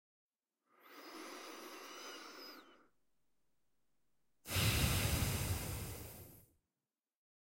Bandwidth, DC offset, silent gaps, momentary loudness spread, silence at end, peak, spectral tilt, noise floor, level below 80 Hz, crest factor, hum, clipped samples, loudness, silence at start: 16.5 kHz; under 0.1%; none; 22 LU; 1.1 s; -22 dBFS; -3.5 dB/octave; under -90 dBFS; -54 dBFS; 22 dB; none; under 0.1%; -39 LUFS; 0.85 s